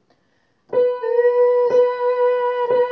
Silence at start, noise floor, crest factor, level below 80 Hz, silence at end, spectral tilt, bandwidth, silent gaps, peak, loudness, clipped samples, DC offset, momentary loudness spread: 0.7 s; -64 dBFS; 12 dB; -74 dBFS; 0 s; -5.5 dB/octave; 5.4 kHz; none; -6 dBFS; -18 LUFS; under 0.1%; under 0.1%; 5 LU